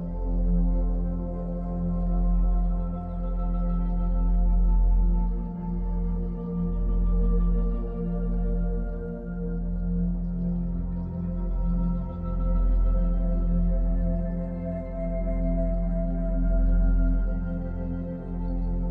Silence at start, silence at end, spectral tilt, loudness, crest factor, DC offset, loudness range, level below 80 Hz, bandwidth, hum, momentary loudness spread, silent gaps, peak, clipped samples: 0 s; 0 s; -12.5 dB/octave; -29 LUFS; 12 dB; under 0.1%; 2 LU; -26 dBFS; 2.2 kHz; none; 7 LU; none; -14 dBFS; under 0.1%